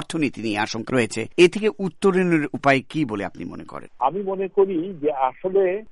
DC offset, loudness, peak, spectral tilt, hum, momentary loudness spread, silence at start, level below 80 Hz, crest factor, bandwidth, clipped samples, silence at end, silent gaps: under 0.1%; -22 LUFS; -4 dBFS; -5.5 dB/octave; none; 10 LU; 0 s; -56 dBFS; 18 dB; 11.5 kHz; under 0.1%; 0 s; none